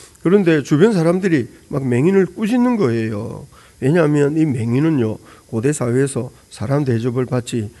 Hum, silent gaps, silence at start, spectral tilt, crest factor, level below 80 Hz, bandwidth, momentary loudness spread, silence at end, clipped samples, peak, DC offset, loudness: none; none; 0 s; -7 dB/octave; 16 dB; -54 dBFS; 12 kHz; 12 LU; 0.1 s; under 0.1%; 0 dBFS; under 0.1%; -17 LUFS